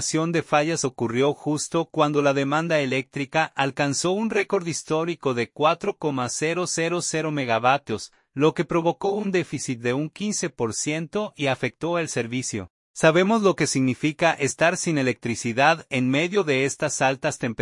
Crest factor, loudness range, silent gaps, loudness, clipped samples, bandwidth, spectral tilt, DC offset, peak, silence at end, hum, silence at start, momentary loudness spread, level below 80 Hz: 20 dB; 4 LU; 12.70-12.94 s; -23 LUFS; under 0.1%; 11.5 kHz; -4.5 dB/octave; under 0.1%; -4 dBFS; 0 s; none; 0 s; 6 LU; -64 dBFS